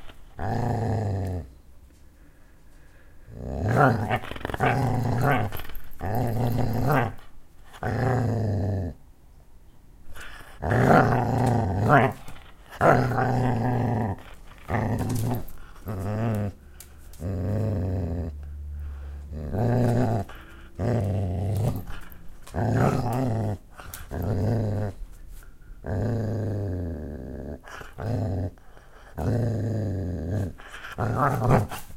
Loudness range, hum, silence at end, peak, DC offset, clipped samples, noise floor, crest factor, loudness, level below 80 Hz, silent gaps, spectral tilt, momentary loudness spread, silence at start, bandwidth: 8 LU; none; 0 s; -4 dBFS; under 0.1%; under 0.1%; -50 dBFS; 22 dB; -26 LUFS; -40 dBFS; none; -7.5 dB/octave; 20 LU; 0 s; 16.5 kHz